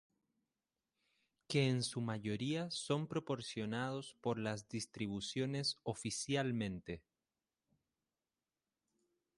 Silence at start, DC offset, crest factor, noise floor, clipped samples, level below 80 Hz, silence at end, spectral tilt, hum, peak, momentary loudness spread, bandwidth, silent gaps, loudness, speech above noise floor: 1.5 s; under 0.1%; 22 dB; under -90 dBFS; under 0.1%; -72 dBFS; 2.4 s; -5 dB/octave; none; -20 dBFS; 7 LU; 11.5 kHz; none; -40 LUFS; over 50 dB